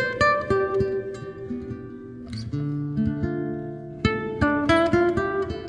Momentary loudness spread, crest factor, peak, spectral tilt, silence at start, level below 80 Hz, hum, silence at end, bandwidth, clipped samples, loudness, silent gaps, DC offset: 15 LU; 18 dB; -6 dBFS; -7 dB/octave; 0 s; -44 dBFS; none; 0 s; 10 kHz; under 0.1%; -24 LUFS; none; under 0.1%